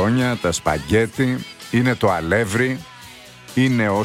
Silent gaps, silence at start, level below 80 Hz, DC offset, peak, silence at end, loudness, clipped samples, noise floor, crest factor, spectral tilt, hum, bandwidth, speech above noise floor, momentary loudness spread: none; 0 s; -44 dBFS; under 0.1%; -4 dBFS; 0 s; -20 LUFS; under 0.1%; -41 dBFS; 16 dB; -5.5 dB/octave; none; 16 kHz; 22 dB; 16 LU